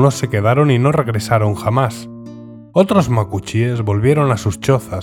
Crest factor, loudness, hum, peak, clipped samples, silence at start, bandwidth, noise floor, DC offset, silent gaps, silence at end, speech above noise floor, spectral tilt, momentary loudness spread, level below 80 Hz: 16 dB; -16 LUFS; none; 0 dBFS; under 0.1%; 0 s; 16 kHz; -34 dBFS; under 0.1%; none; 0 s; 20 dB; -7 dB/octave; 12 LU; -44 dBFS